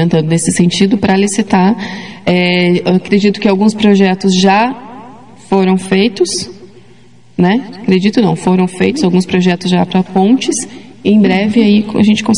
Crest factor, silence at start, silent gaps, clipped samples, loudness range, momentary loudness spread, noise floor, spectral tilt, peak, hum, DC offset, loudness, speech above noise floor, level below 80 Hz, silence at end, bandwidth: 12 dB; 0 s; none; 0.3%; 3 LU; 7 LU; -43 dBFS; -5.5 dB/octave; 0 dBFS; none; 0.9%; -11 LUFS; 33 dB; -48 dBFS; 0 s; 11 kHz